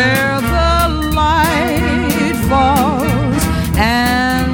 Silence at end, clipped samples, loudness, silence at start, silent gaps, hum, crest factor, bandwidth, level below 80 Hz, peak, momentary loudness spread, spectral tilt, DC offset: 0 s; under 0.1%; -14 LUFS; 0 s; none; none; 14 dB; over 20 kHz; -22 dBFS; 0 dBFS; 3 LU; -5 dB/octave; under 0.1%